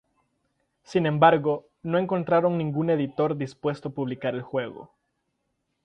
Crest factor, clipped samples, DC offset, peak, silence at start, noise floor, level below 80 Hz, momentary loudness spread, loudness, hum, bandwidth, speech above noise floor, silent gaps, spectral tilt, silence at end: 22 dB; under 0.1%; under 0.1%; -4 dBFS; 0.9 s; -77 dBFS; -66 dBFS; 12 LU; -25 LUFS; none; 9 kHz; 52 dB; none; -8 dB/octave; 1 s